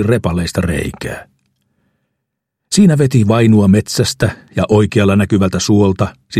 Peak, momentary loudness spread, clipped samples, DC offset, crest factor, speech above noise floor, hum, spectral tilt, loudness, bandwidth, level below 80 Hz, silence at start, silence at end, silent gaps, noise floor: 0 dBFS; 10 LU; under 0.1%; under 0.1%; 14 dB; 63 dB; none; -6 dB/octave; -13 LUFS; 14.5 kHz; -38 dBFS; 0 s; 0 s; none; -75 dBFS